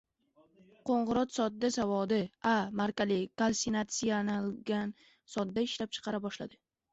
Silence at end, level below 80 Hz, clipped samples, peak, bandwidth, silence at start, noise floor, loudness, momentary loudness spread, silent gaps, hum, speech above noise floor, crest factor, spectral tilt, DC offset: 0.4 s; -66 dBFS; under 0.1%; -18 dBFS; 8.2 kHz; 0.85 s; -68 dBFS; -33 LUFS; 8 LU; none; none; 36 dB; 16 dB; -4.5 dB/octave; under 0.1%